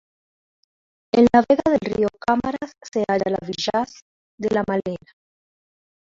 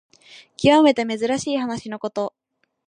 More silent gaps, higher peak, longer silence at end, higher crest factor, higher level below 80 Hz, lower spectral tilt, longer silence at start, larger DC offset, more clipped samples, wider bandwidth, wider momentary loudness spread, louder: first, 4.02-4.38 s vs none; about the same, -4 dBFS vs -4 dBFS; first, 1.15 s vs 0.6 s; about the same, 20 dB vs 18 dB; about the same, -52 dBFS vs -56 dBFS; about the same, -6 dB/octave vs -5 dB/octave; first, 1.15 s vs 0.35 s; neither; neither; second, 7.6 kHz vs 10 kHz; about the same, 14 LU vs 14 LU; about the same, -21 LUFS vs -20 LUFS